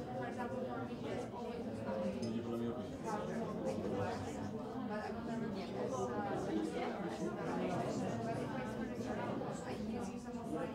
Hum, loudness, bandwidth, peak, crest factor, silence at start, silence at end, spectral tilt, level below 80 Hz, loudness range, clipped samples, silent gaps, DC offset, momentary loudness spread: none; -41 LUFS; 15.5 kHz; -26 dBFS; 14 dB; 0 s; 0 s; -6.5 dB/octave; -64 dBFS; 2 LU; under 0.1%; none; under 0.1%; 4 LU